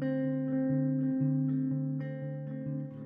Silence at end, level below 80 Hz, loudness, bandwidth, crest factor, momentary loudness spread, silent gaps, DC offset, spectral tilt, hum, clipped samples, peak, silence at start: 0 s; -72 dBFS; -32 LUFS; 3.1 kHz; 12 dB; 8 LU; none; under 0.1%; -11 dB/octave; none; under 0.1%; -20 dBFS; 0 s